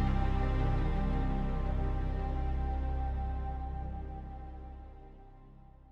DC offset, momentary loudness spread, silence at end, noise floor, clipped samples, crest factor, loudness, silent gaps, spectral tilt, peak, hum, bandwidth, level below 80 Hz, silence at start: under 0.1%; 17 LU; 0 s; -54 dBFS; under 0.1%; 14 dB; -36 LUFS; none; -9 dB/octave; -18 dBFS; none; 5.4 kHz; -34 dBFS; 0 s